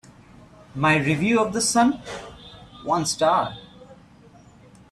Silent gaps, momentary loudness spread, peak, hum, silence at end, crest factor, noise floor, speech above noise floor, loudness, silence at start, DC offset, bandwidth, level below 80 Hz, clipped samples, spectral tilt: none; 22 LU; -6 dBFS; none; 1 s; 18 dB; -50 dBFS; 29 dB; -21 LUFS; 0.75 s; under 0.1%; 14.5 kHz; -54 dBFS; under 0.1%; -4 dB/octave